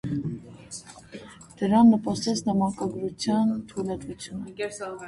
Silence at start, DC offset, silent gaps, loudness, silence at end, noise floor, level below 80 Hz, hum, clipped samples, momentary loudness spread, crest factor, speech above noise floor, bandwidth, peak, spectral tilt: 0.05 s; under 0.1%; none; -25 LUFS; 0 s; -44 dBFS; -56 dBFS; none; under 0.1%; 23 LU; 18 dB; 20 dB; 11.5 kHz; -8 dBFS; -6 dB/octave